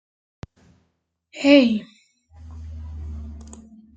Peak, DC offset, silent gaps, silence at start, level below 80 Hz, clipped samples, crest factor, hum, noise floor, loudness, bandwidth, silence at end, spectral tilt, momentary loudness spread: -4 dBFS; under 0.1%; none; 1.35 s; -44 dBFS; under 0.1%; 22 dB; none; -72 dBFS; -17 LUFS; 8.4 kHz; 0.55 s; -6 dB/octave; 28 LU